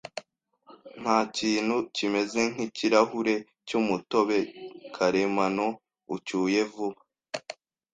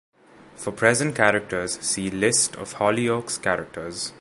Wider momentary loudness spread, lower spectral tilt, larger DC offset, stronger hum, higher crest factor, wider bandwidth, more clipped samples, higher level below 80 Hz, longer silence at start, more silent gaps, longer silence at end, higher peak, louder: first, 15 LU vs 11 LU; first, -4.5 dB/octave vs -3 dB/octave; neither; neither; about the same, 22 dB vs 22 dB; second, 9.4 kHz vs 12 kHz; neither; second, -68 dBFS vs -56 dBFS; second, 0.05 s vs 0.55 s; neither; first, 0.4 s vs 0.05 s; second, -6 dBFS vs -2 dBFS; second, -27 LUFS vs -23 LUFS